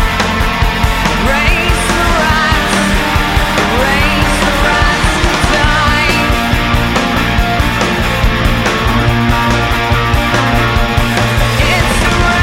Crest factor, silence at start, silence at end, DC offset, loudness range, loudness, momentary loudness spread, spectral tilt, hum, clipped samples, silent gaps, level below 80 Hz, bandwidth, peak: 10 dB; 0 s; 0 s; under 0.1%; 1 LU; -11 LUFS; 2 LU; -4.5 dB/octave; none; under 0.1%; none; -18 dBFS; 16.5 kHz; 0 dBFS